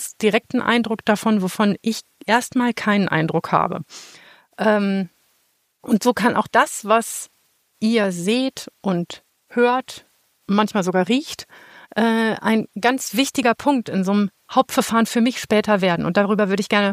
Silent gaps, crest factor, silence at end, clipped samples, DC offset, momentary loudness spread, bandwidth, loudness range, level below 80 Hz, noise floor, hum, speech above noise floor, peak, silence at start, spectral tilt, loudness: none; 18 dB; 0 s; under 0.1%; under 0.1%; 10 LU; 15.5 kHz; 3 LU; -62 dBFS; -66 dBFS; none; 46 dB; -2 dBFS; 0 s; -5 dB/octave; -20 LUFS